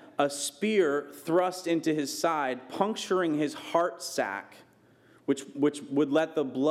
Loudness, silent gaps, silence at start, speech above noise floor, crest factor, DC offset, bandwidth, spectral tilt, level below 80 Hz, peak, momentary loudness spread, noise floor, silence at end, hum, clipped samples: -29 LUFS; none; 0 s; 32 dB; 18 dB; under 0.1%; 15.5 kHz; -4.5 dB/octave; -86 dBFS; -10 dBFS; 6 LU; -60 dBFS; 0 s; none; under 0.1%